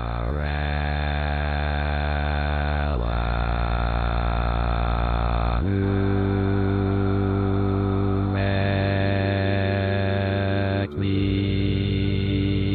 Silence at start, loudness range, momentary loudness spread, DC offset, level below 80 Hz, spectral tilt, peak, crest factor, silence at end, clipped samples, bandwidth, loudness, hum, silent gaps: 0 s; 2 LU; 3 LU; under 0.1%; -28 dBFS; -10 dB/octave; -10 dBFS; 12 dB; 0 s; under 0.1%; 4.6 kHz; -24 LUFS; none; none